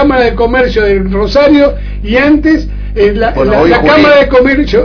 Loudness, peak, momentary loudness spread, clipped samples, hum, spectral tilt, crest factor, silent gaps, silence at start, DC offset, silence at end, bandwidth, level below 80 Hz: -8 LUFS; 0 dBFS; 7 LU; 2%; 50 Hz at -20 dBFS; -7 dB/octave; 8 dB; none; 0 s; under 0.1%; 0 s; 5.4 kHz; -20 dBFS